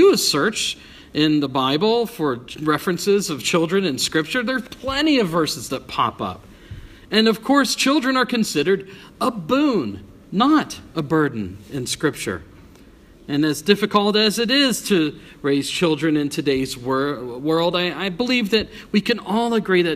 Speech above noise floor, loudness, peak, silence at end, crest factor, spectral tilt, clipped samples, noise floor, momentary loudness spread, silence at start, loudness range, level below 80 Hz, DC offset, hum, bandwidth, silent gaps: 27 dB; -20 LUFS; 0 dBFS; 0 s; 20 dB; -4 dB/octave; under 0.1%; -47 dBFS; 11 LU; 0 s; 3 LU; -50 dBFS; under 0.1%; none; 15.5 kHz; none